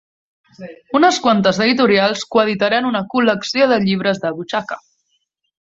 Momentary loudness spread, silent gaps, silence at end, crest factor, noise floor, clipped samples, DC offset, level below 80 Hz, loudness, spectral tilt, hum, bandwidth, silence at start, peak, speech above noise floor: 10 LU; none; 0.8 s; 16 dB; -68 dBFS; under 0.1%; under 0.1%; -58 dBFS; -16 LUFS; -4.5 dB/octave; none; 8 kHz; 0.6 s; 0 dBFS; 52 dB